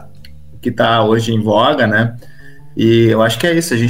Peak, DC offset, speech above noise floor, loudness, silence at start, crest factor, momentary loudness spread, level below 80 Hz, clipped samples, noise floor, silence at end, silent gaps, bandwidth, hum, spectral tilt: 0 dBFS; 2%; 26 dB; -13 LUFS; 0 s; 14 dB; 10 LU; -46 dBFS; under 0.1%; -39 dBFS; 0 s; none; 16.5 kHz; none; -5.5 dB/octave